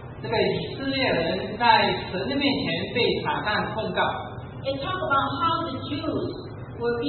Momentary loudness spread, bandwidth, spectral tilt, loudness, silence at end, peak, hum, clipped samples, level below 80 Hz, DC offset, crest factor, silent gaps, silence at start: 10 LU; 4.5 kHz; -10 dB/octave; -25 LUFS; 0 s; -4 dBFS; none; under 0.1%; -50 dBFS; under 0.1%; 20 dB; none; 0 s